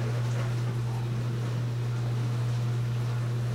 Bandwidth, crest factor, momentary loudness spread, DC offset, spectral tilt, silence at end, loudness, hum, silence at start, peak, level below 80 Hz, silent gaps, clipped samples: 10.5 kHz; 8 dB; 2 LU; under 0.1%; -7 dB/octave; 0 s; -30 LUFS; none; 0 s; -20 dBFS; -54 dBFS; none; under 0.1%